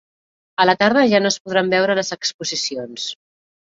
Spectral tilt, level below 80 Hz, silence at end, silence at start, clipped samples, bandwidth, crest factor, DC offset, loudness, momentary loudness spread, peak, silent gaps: -3.5 dB/octave; -62 dBFS; 0.5 s; 0.6 s; under 0.1%; 7.8 kHz; 18 dB; under 0.1%; -18 LUFS; 13 LU; -2 dBFS; 1.40-1.45 s, 2.34-2.39 s